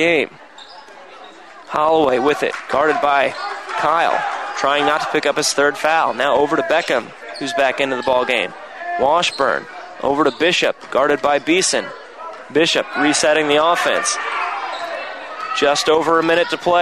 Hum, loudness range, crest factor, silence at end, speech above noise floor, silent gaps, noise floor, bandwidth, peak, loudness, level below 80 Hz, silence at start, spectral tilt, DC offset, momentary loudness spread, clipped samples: none; 2 LU; 14 dB; 0 s; 23 dB; none; -39 dBFS; 14.5 kHz; -2 dBFS; -17 LUFS; -56 dBFS; 0 s; -2.5 dB/octave; 0.2%; 11 LU; under 0.1%